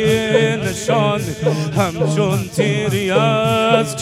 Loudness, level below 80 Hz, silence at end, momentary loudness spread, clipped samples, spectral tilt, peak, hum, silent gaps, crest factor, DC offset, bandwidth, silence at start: -17 LUFS; -46 dBFS; 0 s; 4 LU; under 0.1%; -5.5 dB/octave; 0 dBFS; none; none; 16 dB; under 0.1%; 15.5 kHz; 0 s